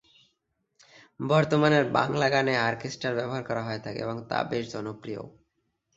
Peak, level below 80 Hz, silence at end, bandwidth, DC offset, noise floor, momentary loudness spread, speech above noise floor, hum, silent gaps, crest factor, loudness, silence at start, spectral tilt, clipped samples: -8 dBFS; -64 dBFS; 0.65 s; 8 kHz; under 0.1%; -77 dBFS; 15 LU; 50 dB; none; none; 22 dB; -27 LUFS; 1.2 s; -6 dB/octave; under 0.1%